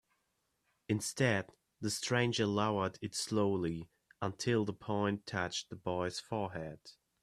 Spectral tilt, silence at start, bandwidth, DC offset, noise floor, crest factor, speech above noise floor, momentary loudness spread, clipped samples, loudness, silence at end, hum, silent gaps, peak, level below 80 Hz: -4.5 dB/octave; 0.9 s; 15 kHz; under 0.1%; -81 dBFS; 20 dB; 46 dB; 10 LU; under 0.1%; -36 LUFS; 0.3 s; none; none; -16 dBFS; -70 dBFS